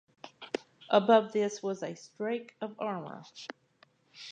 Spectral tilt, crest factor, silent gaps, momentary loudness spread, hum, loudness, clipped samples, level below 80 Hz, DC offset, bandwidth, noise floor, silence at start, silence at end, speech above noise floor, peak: -5 dB/octave; 22 dB; none; 21 LU; none; -31 LUFS; under 0.1%; -88 dBFS; under 0.1%; 9.2 kHz; -66 dBFS; 0.25 s; 0 s; 36 dB; -10 dBFS